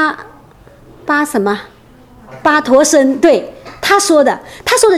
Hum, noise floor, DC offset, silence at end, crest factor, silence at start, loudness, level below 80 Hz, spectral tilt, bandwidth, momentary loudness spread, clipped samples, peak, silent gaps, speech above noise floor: none; -41 dBFS; under 0.1%; 0 s; 12 dB; 0 s; -12 LUFS; -48 dBFS; -2.5 dB/octave; 15.5 kHz; 12 LU; 0.1%; 0 dBFS; none; 30 dB